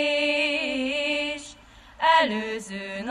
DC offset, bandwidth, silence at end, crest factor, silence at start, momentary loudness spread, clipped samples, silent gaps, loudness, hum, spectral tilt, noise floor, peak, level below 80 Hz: under 0.1%; 12 kHz; 0 s; 18 dB; 0 s; 13 LU; under 0.1%; none; -24 LUFS; none; -3 dB/octave; -49 dBFS; -8 dBFS; -58 dBFS